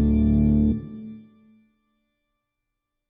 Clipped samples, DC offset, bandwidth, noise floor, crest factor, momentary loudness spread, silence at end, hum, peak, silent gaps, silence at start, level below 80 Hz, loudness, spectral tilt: under 0.1%; under 0.1%; 3.7 kHz; -81 dBFS; 14 dB; 20 LU; 1.9 s; none; -10 dBFS; none; 0 s; -32 dBFS; -21 LUFS; -12 dB/octave